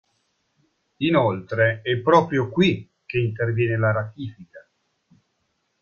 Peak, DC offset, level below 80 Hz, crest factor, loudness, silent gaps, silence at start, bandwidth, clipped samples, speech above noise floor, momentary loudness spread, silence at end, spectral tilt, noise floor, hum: -2 dBFS; under 0.1%; -58 dBFS; 22 dB; -22 LUFS; none; 1 s; 7 kHz; under 0.1%; 51 dB; 12 LU; 1.2 s; -7.5 dB/octave; -72 dBFS; none